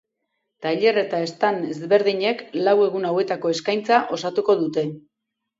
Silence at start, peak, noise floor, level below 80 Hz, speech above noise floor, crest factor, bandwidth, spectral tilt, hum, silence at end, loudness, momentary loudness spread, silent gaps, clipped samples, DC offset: 0.6 s; -2 dBFS; -81 dBFS; -72 dBFS; 61 dB; 18 dB; 7.8 kHz; -5 dB/octave; none; 0.6 s; -21 LUFS; 7 LU; none; under 0.1%; under 0.1%